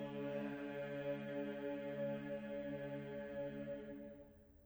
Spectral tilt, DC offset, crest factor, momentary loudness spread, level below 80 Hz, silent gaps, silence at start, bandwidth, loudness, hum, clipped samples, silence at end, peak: -8 dB/octave; under 0.1%; 14 dB; 8 LU; -72 dBFS; none; 0 s; over 20 kHz; -46 LUFS; none; under 0.1%; 0 s; -32 dBFS